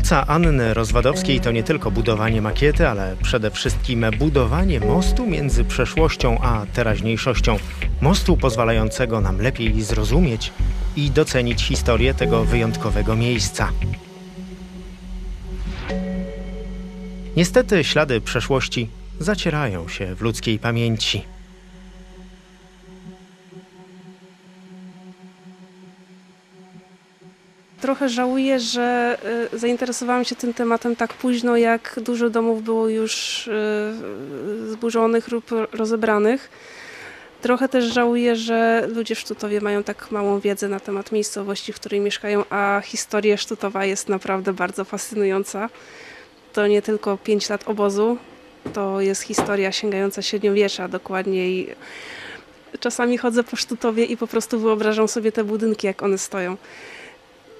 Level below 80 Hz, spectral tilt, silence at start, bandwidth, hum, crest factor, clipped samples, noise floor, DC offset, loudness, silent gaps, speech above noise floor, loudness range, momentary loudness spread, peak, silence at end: -30 dBFS; -5 dB/octave; 0 s; 14.5 kHz; none; 20 dB; under 0.1%; -51 dBFS; under 0.1%; -21 LUFS; none; 31 dB; 5 LU; 14 LU; 0 dBFS; 0 s